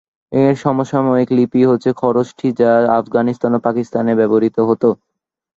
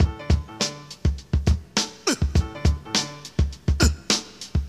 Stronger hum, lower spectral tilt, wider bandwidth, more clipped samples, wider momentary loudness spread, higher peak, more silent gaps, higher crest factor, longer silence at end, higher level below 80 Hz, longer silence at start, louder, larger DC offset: neither; first, -8.5 dB/octave vs -4 dB/octave; second, 7.6 kHz vs 13.5 kHz; neither; about the same, 5 LU vs 6 LU; about the same, -2 dBFS vs 0 dBFS; neither; second, 14 dB vs 22 dB; first, 0.6 s vs 0 s; second, -56 dBFS vs -28 dBFS; first, 0.3 s vs 0 s; first, -15 LUFS vs -24 LUFS; neither